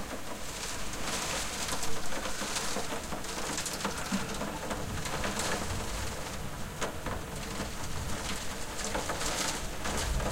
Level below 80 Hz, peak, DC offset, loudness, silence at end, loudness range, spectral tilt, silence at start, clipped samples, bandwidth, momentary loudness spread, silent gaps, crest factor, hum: -44 dBFS; -16 dBFS; under 0.1%; -35 LUFS; 0 s; 2 LU; -3 dB/octave; 0 s; under 0.1%; 16.5 kHz; 6 LU; none; 16 dB; none